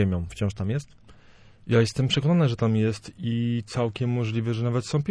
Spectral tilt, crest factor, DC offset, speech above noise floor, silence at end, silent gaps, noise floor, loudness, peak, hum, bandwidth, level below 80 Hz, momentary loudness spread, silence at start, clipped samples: -6.5 dB/octave; 16 dB; under 0.1%; 27 dB; 0 s; none; -51 dBFS; -25 LUFS; -8 dBFS; none; 10.5 kHz; -50 dBFS; 8 LU; 0 s; under 0.1%